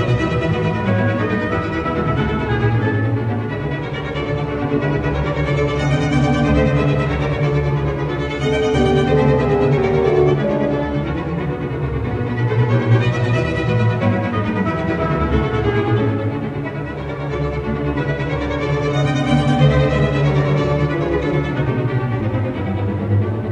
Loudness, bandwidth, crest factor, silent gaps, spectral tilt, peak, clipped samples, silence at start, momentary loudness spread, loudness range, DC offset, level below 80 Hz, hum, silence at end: -18 LUFS; 8.4 kHz; 16 dB; none; -8 dB/octave; -2 dBFS; under 0.1%; 0 s; 7 LU; 4 LU; under 0.1%; -30 dBFS; none; 0 s